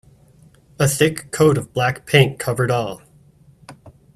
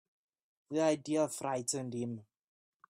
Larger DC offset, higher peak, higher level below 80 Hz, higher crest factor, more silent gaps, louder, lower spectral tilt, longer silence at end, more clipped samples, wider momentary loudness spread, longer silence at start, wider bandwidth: neither; first, 0 dBFS vs -18 dBFS; first, -50 dBFS vs -80 dBFS; about the same, 20 dB vs 18 dB; neither; first, -18 LUFS vs -35 LUFS; about the same, -5 dB/octave vs -4.5 dB/octave; second, 0.25 s vs 0.7 s; neither; about the same, 7 LU vs 9 LU; about the same, 0.8 s vs 0.7 s; about the same, 15 kHz vs 15.5 kHz